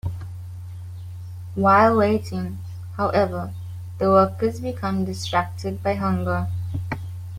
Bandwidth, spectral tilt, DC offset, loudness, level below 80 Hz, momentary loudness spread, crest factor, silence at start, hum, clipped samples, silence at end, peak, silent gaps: 16 kHz; -7 dB/octave; under 0.1%; -22 LUFS; -50 dBFS; 19 LU; 20 dB; 0.05 s; none; under 0.1%; 0 s; -4 dBFS; none